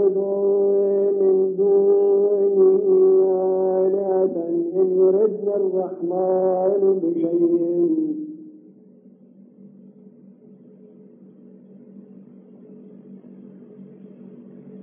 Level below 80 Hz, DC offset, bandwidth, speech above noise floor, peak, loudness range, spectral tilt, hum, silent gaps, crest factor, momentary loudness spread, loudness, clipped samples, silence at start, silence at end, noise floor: -88 dBFS; under 0.1%; 1.8 kHz; 30 dB; -8 dBFS; 8 LU; -8.5 dB/octave; none; none; 14 dB; 7 LU; -19 LUFS; under 0.1%; 0 s; 0 s; -49 dBFS